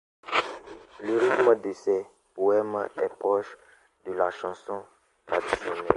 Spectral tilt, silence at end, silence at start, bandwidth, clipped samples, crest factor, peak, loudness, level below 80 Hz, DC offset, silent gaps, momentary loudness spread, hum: -5 dB/octave; 0 s; 0.25 s; 11 kHz; under 0.1%; 26 dB; -2 dBFS; -27 LUFS; -62 dBFS; under 0.1%; none; 16 LU; none